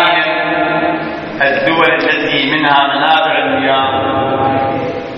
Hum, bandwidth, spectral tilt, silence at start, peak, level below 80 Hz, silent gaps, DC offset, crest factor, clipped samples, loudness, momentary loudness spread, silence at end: none; 7 kHz; -6.5 dB/octave; 0 s; 0 dBFS; -48 dBFS; none; under 0.1%; 12 dB; under 0.1%; -12 LUFS; 5 LU; 0 s